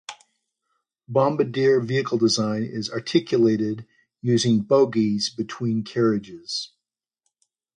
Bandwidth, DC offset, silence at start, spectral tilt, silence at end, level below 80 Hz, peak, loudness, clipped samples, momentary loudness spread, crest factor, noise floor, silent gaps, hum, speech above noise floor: 10 kHz; under 0.1%; 0.1 s; -5.5 dB/octave; 1.1 s; -64 dBFS; -6 dBFS; -22 LUFS; under 0.1%; 10 LU; 18 dB; -86 dBFS; none; none; 65 dB